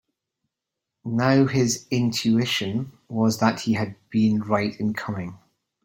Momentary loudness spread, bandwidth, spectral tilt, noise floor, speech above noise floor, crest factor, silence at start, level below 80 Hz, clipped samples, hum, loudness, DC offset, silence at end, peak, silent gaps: 12 LU; 16.5 kHz; -5.5 dB/octave; -85 dBFS; 62 dB; 20 dB; 1.05 s; -60 dBFS; under 0.1%; none; -23 LUFS; under 0.1%; 0.5 s; -4 dBFS; none